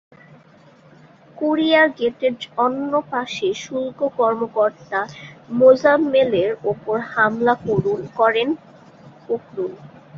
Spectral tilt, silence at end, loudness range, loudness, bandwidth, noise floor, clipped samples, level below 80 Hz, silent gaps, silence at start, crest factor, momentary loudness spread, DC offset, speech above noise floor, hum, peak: -5.5 dB/octave; 0 s; 4 LU; -19 LUFS; 7.2 kHz; -49 dBFS; under 0.1%; -60 dBFS; none; 1.35 s; 18 dB; 12 LU; under 0.1%; 30 dB; none; -2 dBFS